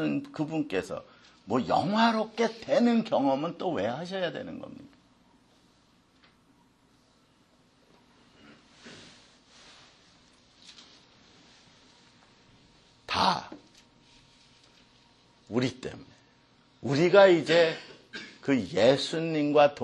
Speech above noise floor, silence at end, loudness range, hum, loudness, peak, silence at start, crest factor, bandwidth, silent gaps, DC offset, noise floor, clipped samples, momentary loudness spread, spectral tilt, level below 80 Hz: 38 dB; 0 s; 14 LU; none; -26 LUFS; -6 dBFS; 0 s; 24 dB; 11.5 kHz; none; under 0.1%; -64 dBFS; under 0.1%; 21 LU; -5.5 dB/octave; -68 dBFS